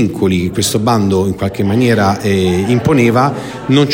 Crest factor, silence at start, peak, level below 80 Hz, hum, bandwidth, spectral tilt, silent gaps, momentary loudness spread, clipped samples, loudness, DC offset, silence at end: 12 dB; 0 s; 0 dBFS; -42 dBFS; none; 16.5 kHz; -6 dB/octave; none; 5 LU; under 0.1%; -13 LUFS; under 0.1%; 0 s